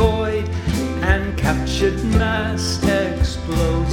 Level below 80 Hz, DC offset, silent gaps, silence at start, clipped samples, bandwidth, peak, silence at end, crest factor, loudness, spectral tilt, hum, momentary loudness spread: -24 dBFS; under 0.1%; none; 0 s; under 0.1%; 17 kHz; 0 dBFS; 0 s; 18 dB; -20 LUFS; -5.5 dB/octave; none; 4 LU